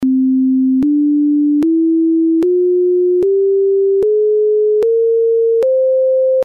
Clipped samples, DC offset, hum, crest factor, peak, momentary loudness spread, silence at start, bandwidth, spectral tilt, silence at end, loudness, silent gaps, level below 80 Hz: under 0.1%; under 0.1%; none; 4 dB; -8 dBFS; 0 LU; 0 s; 4.2 kHz; -9 dB/octave; 0 s; -13 LUFS; none; -56 dBFS